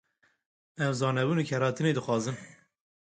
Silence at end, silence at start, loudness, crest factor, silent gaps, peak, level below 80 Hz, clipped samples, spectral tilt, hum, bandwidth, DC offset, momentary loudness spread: 0.55 s; 0.8 s; -29 LUFS; 16 dB; none; -14 dBFS; -70 dBFS; under 0.1%; -6 dB/octave; none; 9.4 kHz; under 0.1%; 6 LU